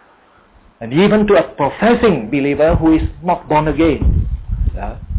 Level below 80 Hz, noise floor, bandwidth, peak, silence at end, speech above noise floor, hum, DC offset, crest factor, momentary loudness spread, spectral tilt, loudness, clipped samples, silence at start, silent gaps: -24 dBFS; -49 dBFS; 4 kHz; -4 dBFS; 0 s; 36 dB; none; under 0.1%; 12 dB; 10 LU; -11.5 dB/octave; -15 LUFS; under 0.1%; 0.8 s; none